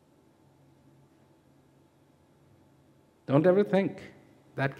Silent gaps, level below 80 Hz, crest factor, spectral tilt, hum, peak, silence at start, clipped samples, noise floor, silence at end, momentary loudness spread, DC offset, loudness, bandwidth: none; -76 dBFS; 24 dB; -9 dB/octave; none; -8 dBFS; 3.3 s; under 0.1%; -63 dBFS; 0.05 s; 24 LU; under 0.1%; -26 LUFS; 10 kHz